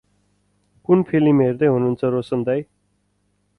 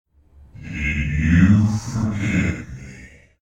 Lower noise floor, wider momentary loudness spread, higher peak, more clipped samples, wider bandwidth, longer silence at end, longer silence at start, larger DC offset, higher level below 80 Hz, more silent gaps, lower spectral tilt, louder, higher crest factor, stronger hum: first, -67 dBFS vs -49 dBFS; second, 8 LU vs 22 LU; about the same, -4 dBFS vs -4 dBFS; neither; second, 4.8 kHz vs 9.4 kHz; first, 0.95 s vs 0.35 s; first, 0.9 s vs 0.55 s; neither; second, -56 dBFS vs -34 dBFS; neither; first, -10 dB/octave vs -7 dB/octave; about the same, -19 LUFS vs -19 LUFS; about the same, 16 dB vs 16 dB; first, 50 Hz at -45 dBFS vs none